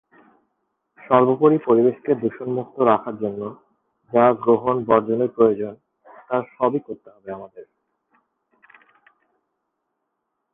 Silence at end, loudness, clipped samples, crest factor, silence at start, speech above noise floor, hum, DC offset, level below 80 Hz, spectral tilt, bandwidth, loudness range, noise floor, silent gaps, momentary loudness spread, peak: 2.9 s; -20 LUFS; under 0.1%; 20 dB; 1.1 s; 58 dB; none; under 0.1%; -64 dBFS; -10.5 dB/octave; 3.8 kHz; 9 LU; -77 dBFS; none; 19 LU; -2 dBFS